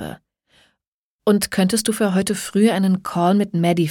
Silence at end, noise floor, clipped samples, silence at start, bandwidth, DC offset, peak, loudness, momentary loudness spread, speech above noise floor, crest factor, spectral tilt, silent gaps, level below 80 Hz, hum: 0 s; -83 dBFS; under 0.1%; 0 s; 18 kHz; under 0.1%; -4 dBFS; -19 LUFS; 4 LU; 65 dB; 16 dB; -5.5 dB/octave; 0.87-1.19 s; -56 dBFS; none